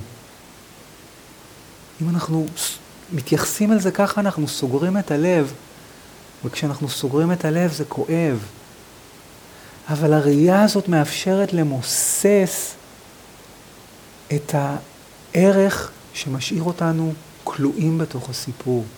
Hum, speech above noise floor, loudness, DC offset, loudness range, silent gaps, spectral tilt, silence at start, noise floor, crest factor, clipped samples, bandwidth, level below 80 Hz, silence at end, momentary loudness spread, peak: none; 25 dB; -20 LUFS; under 0.1%; 5 LU; none; -5.5 dB/octave; 0 s; -44 dBFS; 18 dB; under 0.1%; over 20 kHz; -56 dBFS; 0 s; 14 LU; -2 dBFS